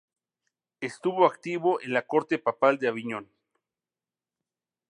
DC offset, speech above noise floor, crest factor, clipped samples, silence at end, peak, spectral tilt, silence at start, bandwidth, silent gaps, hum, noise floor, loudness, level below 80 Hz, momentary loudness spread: under 0.1%; over 64 dB; 22 dB; under 0.1%; 1.7 s; -6 dBFS; -6 dB/octave; 0.8 s; 10.5 kHz; none; none; under -90 dBFS; -26 LUFS; -82 dBFS; 13 LU